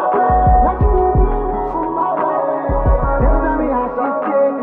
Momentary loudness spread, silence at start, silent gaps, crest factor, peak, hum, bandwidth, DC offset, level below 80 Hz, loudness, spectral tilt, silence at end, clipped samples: 6 LU; 0 s; none; 12 dB; -2 dBFS; none; 3.5 kHz; under 0.1%; -20 dBFS; -16 LUFS; -12.5 dB/octave; 0 s; under 0.1%